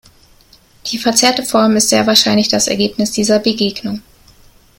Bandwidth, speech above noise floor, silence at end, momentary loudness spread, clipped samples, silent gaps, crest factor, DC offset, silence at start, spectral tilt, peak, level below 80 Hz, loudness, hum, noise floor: 17 kHz; 34 dB; 0.8 s; 13 LU; under 0.1%; none; 16 dB; under 0.1%; 0.85 s; -3 dB/octave; 0 dBFS; -48 dBFS; -13 LUFS; none; -47 dBFS